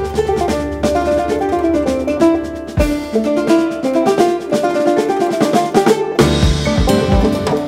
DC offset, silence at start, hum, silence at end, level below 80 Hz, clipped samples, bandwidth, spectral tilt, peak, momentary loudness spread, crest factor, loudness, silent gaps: under 0.1%; 0 s; none; 0 s; -26 dBFS; under 0.1%; 16 kHz; -6 dB/octave; 0 dBFS; 4 LU; 14 dB; -15 LUFS; none